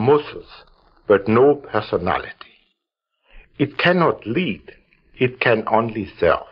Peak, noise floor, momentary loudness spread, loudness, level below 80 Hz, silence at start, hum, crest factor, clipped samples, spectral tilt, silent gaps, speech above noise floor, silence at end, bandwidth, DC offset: -2 dBFS; -78 dBFS; 14 LU; -19 LUFS; -50 dBFS; 0 s; none; 18 dB; under 0.1%; -4.5 dB/octave; none; 60 dB; 0.05 s; 5.6 kHz; under 0.1%